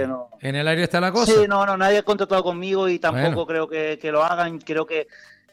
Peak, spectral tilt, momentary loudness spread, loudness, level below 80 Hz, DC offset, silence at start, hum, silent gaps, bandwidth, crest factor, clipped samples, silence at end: -6 dBFS; -5 dB/octave; 10 LU; -21 LUFS; -56 dBFS; under 0.1%; 0 s; none; none; 14.5 kHz; 14 dB; under 0.1%; 0.35 s